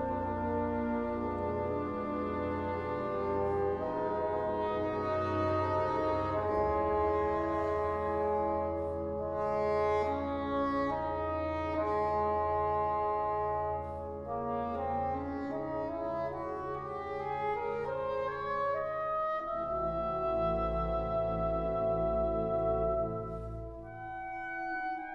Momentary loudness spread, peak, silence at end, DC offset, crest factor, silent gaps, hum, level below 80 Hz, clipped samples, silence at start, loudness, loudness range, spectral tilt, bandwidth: 6 LU; -20 dBFS; 0 s; under 0.1%; 14 dB; none; none; -50 dBFS; under 0.1%; 0 s; -33 LUFS; 4 LU; -8.5 dB/octave; 7.4 kHz